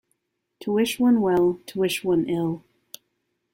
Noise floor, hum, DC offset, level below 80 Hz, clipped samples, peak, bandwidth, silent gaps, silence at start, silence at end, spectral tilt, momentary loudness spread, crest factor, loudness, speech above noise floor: -75 dBFS; none; under 0.1%; -60 dBFS; under 0.1%; -10 dBFS; 16.5 kHz; none; 0.6 s; 0.95 s; -5.5 dB/octave; 9 LU; 14 dB; -23 LUFS; 54 dB